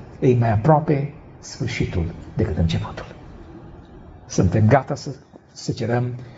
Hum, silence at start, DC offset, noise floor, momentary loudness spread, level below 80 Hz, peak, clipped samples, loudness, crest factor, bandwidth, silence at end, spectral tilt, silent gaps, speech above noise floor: none; 0 s; under 0.1%; -42 dBFS; 24 LU; -40 dBFS; -2 dBFS; under 0.1%; -21 LUFS; 18 dB; 8 kHz; 0 s; -7 dB/octave; none; 22 dB